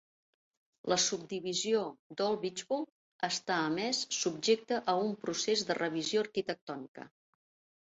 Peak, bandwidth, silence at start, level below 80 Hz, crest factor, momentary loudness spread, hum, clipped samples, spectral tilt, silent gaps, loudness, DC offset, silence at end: -16 dBFS; 8.2 kHz; 0.85 s; -78 dBFS; 18 dB; 11 LU; none; under 0.1%; -2.5 dB/octave; 1.99-2.10 s, 2.92-3.19 s, 6.61-6.67 s, 6.88-6.95 s; -33 LUFS; under 0.1%; 0.75 s